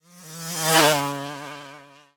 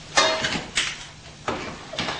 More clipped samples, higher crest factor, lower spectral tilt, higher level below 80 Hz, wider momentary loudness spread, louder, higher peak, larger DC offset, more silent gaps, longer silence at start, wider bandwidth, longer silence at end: neither; about the same, 22 dB vs 22 dB; about the same, -2.5 dB/octave vs -1.5 dB/octave; second, -68 dBFS vs -50 dBFS; first, 22 LU vs 15 LU; first, -20 LUFS vs -25 LUFS; about the same, -4 dBFS vs -4 dBFS; neither; neither; first, 0.15 s vs 0 s; first, 19.5 kHz vs 10 kHz; first, 0.35 s vs 0 s